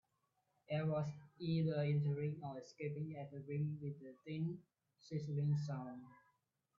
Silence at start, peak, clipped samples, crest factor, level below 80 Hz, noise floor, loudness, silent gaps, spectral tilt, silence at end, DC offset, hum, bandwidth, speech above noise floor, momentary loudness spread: 0.7 s; -28 dBFS; under 0.1%; 14 dB; -80 dBFS; -84 dBFS; -42 LUFS; none; -8 dB/octave; 0.65 s; under 0.1%; none; 7 kHz; 43 dB; 12 LU